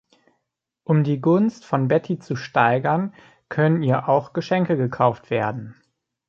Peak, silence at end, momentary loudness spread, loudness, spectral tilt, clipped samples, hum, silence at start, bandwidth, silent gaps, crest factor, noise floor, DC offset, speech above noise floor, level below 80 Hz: -4 dBFS; 0.55 s; 9 LU; -21 LUFS; -8.5 dB/octave; under 0.1%; none; 0.9 s; 7.2 kHz; none; 18 dB; -79 dBFS; under 0.1%; 58 dB; -62 dBFS